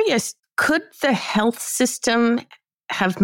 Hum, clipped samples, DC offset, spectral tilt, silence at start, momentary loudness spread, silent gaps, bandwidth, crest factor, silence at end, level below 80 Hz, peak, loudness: none; under 0.1%; under 0.1%; -3.5 dB/octave; 0 s; 5 LU; 2.74-2.78 s; 17 kHz; 12 dB; 0 s; -60 dBFS; -8 dBFS; -21 LUFS